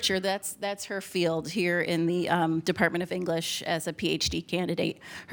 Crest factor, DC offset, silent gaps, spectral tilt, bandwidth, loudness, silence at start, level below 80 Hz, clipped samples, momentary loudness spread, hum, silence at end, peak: 20 dB; under 0.1%; none; -4 dB/octave; over 20 kHz; -28 LUFS; 0 s; -56 dBFS; under 0.1%; 6 LU; none; 0 s; -8 dBFS